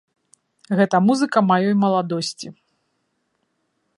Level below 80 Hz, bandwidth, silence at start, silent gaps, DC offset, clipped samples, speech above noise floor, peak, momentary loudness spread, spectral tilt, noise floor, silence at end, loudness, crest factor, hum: -70 dBFS; 11 kHz; 0.7 s; none; under 0.1%; under 0.1%; 53 dB; -2 dBFS; 11 LU; -6 dB/octave; -71 dBFS; 1.45 s; -19 LUFS; 20 dB; none